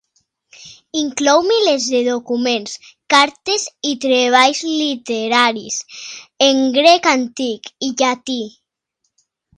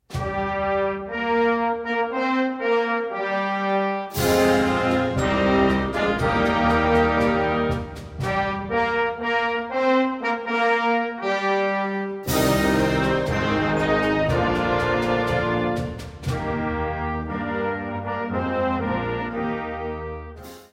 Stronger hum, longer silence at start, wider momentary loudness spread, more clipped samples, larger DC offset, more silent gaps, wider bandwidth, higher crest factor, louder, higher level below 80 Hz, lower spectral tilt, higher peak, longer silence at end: neither; first, 0.6 s vs 0.1 s; first, 13 LU vs 8 LU; neither; neither; neither; second, 11 kHz vs 16.5 kHz; about the same, 18 dB vs 16 dB; first, -16 LUFS vs -22 LUFS; second, -66 dBFS vs -40 dBFS; second, -1.5 dB/octave vs -5.5 dB/octave; first, 0 dBFS vs -6 dBFS; first, 1.1 s vs 0.1 s